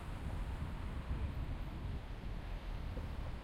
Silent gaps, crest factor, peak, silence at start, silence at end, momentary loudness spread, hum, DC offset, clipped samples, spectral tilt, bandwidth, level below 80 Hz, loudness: none; 12 dB; -30 dBFS; 0 s; 0 s; 4 LU; none; under 0.1%; under 0.1%; -7 dB/octave; 14.5 kHz; -44 dBFS; -45 LUFS